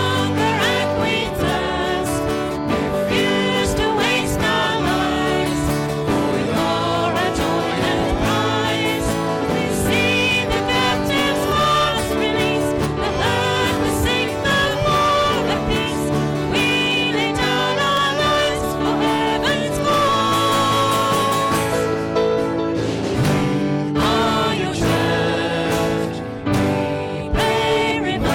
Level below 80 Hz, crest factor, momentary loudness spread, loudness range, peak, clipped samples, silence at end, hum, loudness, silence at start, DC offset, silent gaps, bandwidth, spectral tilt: -36 dBFS; 10 dB; 4 LU; 2 LU; -8 dBFS; under 0.1%; 0 s; none; -18 LUFS; 0 s; under 0.1%; none; 16.5 kHz; -4.5 dB/octave